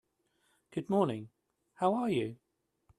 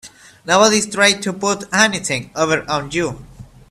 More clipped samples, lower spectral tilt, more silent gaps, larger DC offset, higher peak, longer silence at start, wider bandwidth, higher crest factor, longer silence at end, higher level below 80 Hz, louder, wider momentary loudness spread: neither; first, -7.5 dB/octave vs -2.5 dB/octave; neither; neither; second, -14 dBFS vs 0 dBFS; first, 0.7 s vs 0.05 s; second, 12.5 kHz vs 14 kHz; about the same, 20 dB vs 18 dB; first, 0.65 s vs 0.25 s; second, -74 dBFS vs -50 dBFS; second, -33 LUFS vs -16 LUFS; about the same, 11 LU vs 9 LU